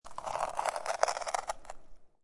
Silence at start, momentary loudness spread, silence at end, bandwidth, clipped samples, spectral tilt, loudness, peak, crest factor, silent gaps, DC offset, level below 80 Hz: 0.05 s; 15 LU; 0.15 s; 11.5 kHz; under 0.1%; -0.5 dB/octave; -35 LUFS; -10 dBFS; 26 dB; none; under 0.1%; -58 dBFS